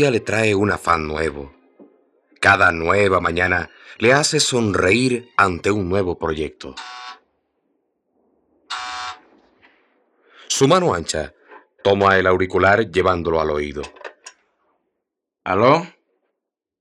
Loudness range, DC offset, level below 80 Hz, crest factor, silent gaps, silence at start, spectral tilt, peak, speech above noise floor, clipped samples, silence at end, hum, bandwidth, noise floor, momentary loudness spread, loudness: 13 LU; under 0.1%; -48 dBFS; 20 dB; none; 0 s; -4 dB/octave; -2 dBFS; 63 dB; under 0.1%; 0.9 s; none; 13.5 kHz; -81 dBFS; 18 LU; -18 LUFS